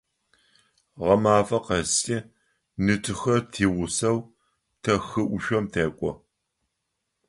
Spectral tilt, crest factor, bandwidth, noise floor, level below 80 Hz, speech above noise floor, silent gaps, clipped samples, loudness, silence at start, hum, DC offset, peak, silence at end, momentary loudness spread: -4.5 dB/octave; 20 dB; 11.5 kHz; -80 dBFS; -50 dBFS; 56 dB; none; under 0.1%; -25 LUFS; 0.95 s; none; under 0.1%; -6 dBFS; 1.15 s; 11 LU